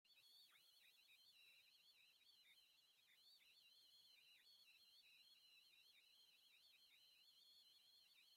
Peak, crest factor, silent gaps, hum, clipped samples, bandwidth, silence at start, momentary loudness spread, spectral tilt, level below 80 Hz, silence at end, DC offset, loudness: -62 dBFS; 12 dB; none; none; under 0.1%; 16.5 kHz; 0.05 s; 0 LU; 1.5 dB/octave; under -90 dBFS; 0 s; under 0.1%; -70 LUFS